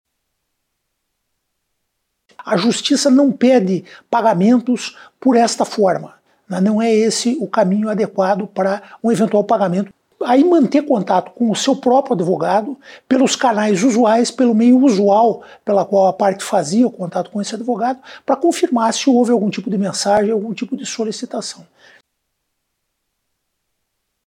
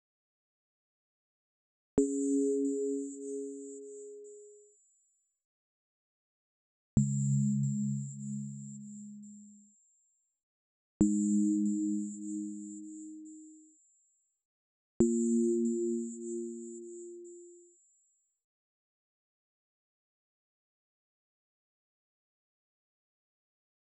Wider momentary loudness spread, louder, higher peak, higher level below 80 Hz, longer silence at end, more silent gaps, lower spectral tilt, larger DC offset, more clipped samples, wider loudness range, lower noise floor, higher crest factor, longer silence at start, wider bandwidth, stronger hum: second, 11 LU vs 20 LU; first, -16 LUFS vs -33 LUFS; first, -4 dBFS vs -14 dBFS; about the same, -68 dBFS vs -64 dBFS; second, 2.7 s vs 6.4 s; second, none vs 5.44-6.97 s, 10.43-11.00 s, 14.45-15.00 s; second, -5 dB/octave vs -9 dB/octave; neither; neither; second, 7 LU vs 13 LU; about the same, -73 dBFS vs -76 dBFS; second, 14 dB vs 24 dB; first, 2.4 s vs 1.95 s; first, 12.5 kHz vs 9.2 kHz; neither